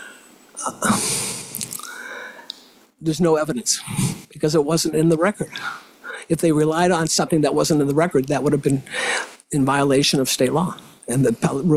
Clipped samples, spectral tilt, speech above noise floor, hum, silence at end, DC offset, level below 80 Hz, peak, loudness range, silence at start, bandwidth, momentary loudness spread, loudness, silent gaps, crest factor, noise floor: under 0.1%; -4.5 dB/octave; 26 dB; none; 0 s; under 0.1%; -52 dBFS; -6 dBFS; 4 LU; 0 s; 16 kHz; 16 LU; -20 LUFS; none; 14 dB; -46 dBFS